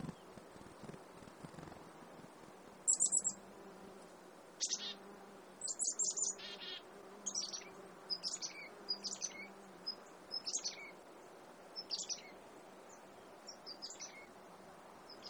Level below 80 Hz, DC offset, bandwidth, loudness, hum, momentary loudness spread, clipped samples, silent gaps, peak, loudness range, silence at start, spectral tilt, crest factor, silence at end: -78 dBFS; under 0.1%; over 20 kHz; -40 LUFS; none; 22 LU; under 0.1%; none; -22 dBFS; 9 LU; 0 s; -0.5 dB/octave; 24 dB; 0 s